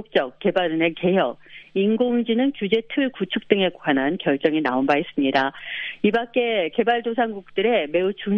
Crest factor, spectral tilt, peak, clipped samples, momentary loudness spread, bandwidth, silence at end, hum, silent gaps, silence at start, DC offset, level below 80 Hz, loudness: 20 dB; -7.5 dB/octave; -2 dBFS; under 0.1%; 4 LU; 6.4 kHz; 0 s; none; none; 0 s; under 0.1%; -62 dBFS; -22 LUFS